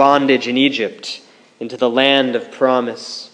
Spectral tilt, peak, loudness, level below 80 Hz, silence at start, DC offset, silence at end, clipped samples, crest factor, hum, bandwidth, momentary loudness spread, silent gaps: -4 dB/octave; 0 dBFS; -16 LUFS; -70 dBFS; 0 s; under 0.1%; 0.05 s; under 0.1%; 16 dB; none; 10 kHz; 16 LU; none